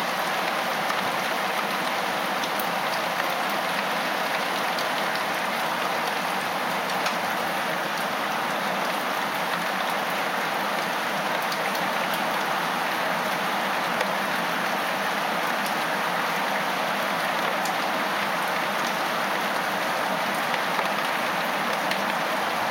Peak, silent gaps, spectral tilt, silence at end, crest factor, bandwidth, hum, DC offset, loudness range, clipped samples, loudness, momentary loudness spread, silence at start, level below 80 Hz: -8 dBFS; none; -2.5 dB/octave; 0 s; 18 dB; 17 kHz; none; under 0.1%; 1 LU; under 0.1%; -25 LUFS; 1 LU; 0 s; -76 dBFS